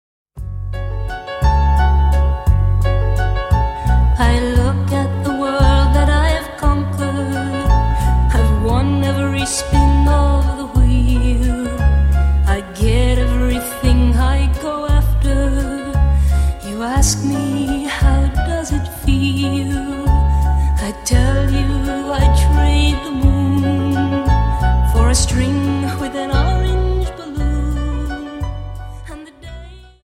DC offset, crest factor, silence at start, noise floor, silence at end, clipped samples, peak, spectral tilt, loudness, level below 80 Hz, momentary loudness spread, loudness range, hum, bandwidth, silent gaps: under 0.1%; 14 dB; 0.35 s; -35 dBFS; 0.25 s; under 0.1%; -2 dBFS; -6 dB/octave; -16 LUFS; -16 dBFS; 9 LU; 2 LU; none; 14 kHz; none